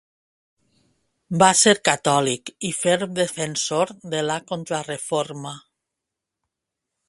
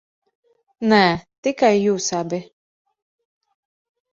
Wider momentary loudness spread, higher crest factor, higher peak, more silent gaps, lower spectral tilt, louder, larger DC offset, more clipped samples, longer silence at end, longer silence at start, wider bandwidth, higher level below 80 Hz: about the same, 13 LU vs 11 LU; about the same, 24 dB vs 20 dB; about the same, 0 dBFS vs -2 dBFS; second, none vs 1.38-1.43 s; second, -3 dB/octave vs -4.5 dB/octave; about the same, -21 LUFS vs -19 LUFS; neither; neither; second, 1.5 s vs 1.7 s; first, 1.3 s vs 0.8 s; first, 11.5 kHz vs 7.6 kHz; second, -64 dBFS vs -58 dBFS